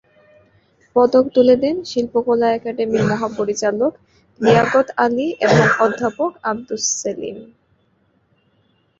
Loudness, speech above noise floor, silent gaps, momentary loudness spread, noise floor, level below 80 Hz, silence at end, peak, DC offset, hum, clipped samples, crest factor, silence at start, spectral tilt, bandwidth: -17 LUFS; 44 dB; none; 9 LU; -61 dBFS; -54 dBFS; 1.55 s; -2 dBFS; under 0.1%; none; under 0.1%; 18 dB; 0.95 s; -4.5 dB/octave; 7.8 kHz